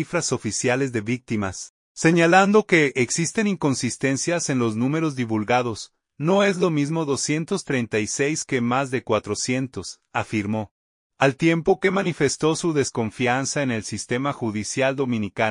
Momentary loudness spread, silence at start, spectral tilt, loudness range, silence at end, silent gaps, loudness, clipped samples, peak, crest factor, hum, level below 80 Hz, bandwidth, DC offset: 9 LU; 0 s; -4.5 dB/octave; 4 LU; 0 s; 1.70-1.95 s, 10.71-11.10 s; -22 LUFS; under 0.1%; -2 dBFS; 20 dB; none; -60 dBFS; 11 kHz; under 0.1%